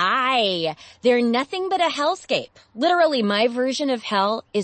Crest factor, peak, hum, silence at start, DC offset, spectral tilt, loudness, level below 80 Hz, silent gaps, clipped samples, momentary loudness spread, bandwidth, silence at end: 14 dB; -6 dBFS; none; 0 s; under 0.1%; -4 dB/octave; -21 LUFS; -66 dBFS; none; under 0.1%; 7 LU; 8.8 kHz; 0 s